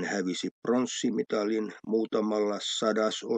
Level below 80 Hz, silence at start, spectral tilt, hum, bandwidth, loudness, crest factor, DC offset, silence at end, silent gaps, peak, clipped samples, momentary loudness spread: -84 dBFS; 0 s; -4 dB/octave; none; 9.4 kHz; -29 LUFS; 16 dB; under 0.1%; 0 s; 0.51-0.62 s; -12 dBFS; under 0.1%; 4 LU